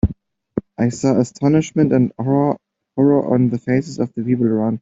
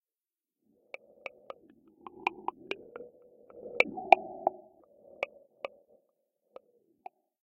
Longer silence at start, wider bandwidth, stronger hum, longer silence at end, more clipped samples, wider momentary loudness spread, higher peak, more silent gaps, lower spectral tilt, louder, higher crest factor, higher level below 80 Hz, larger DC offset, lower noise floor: second, 0.05 s vs 2.15 s; second, 8 kHz vs 9.6 kHz; neither; second, 0.05 s vs 1.75 s; neither; second, 11 LU vs 28 LU; about the same, -2 dBFS vs -2 dBFS; neither; first, -8 dB/octave vs -4 dB/octave; first, -18 LUFS vs -31 LUFS; second, 14 dB vs 34 dB; first, -38 dBFS vs -78 dBFS; neither; second, -38 dBFS vs under -90 dBFS